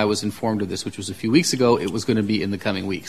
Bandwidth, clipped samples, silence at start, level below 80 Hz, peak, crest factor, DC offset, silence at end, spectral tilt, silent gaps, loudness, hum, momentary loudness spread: 14 kHz; under 0.1%; 0 s; -56 dBFS; -4 dBFS; 18 dB; 0.4%; 0 s; -5 dB/octave; none; -22 LUFS; none; 9 LU